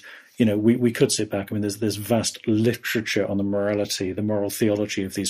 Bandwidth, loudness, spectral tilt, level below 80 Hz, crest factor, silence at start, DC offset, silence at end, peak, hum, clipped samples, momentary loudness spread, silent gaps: 15.5 kHz; -23 LUFS; -5 dB/octave; -60 dBFS; 18 dB; 0.05 s; under 0.1%; 0 s; -6 dBFS; none; under 0.1%; 6 LU; none